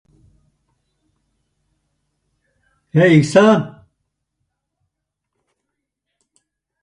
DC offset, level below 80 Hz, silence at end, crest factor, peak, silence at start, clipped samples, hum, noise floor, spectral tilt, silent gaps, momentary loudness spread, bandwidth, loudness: under 0.1%; -60 dBFS; 3.15 s; 20 dB; 0 dBFS; 2.95 s; under 0.1%; none; -78 dBFS; -7 dB/octave; none; 10 LU; 11 kHz; -13 LUFS